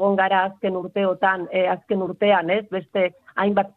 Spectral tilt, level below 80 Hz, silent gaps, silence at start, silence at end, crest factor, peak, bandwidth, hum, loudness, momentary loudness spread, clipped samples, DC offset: -8.5 dB/octave; -66 dBFS; none; 0 s; 0.05 s; 16 dB; -4 dBFS; 4.3 kHz; none; -22 LUFS; 6 LU; under 0.1%; under 0.1%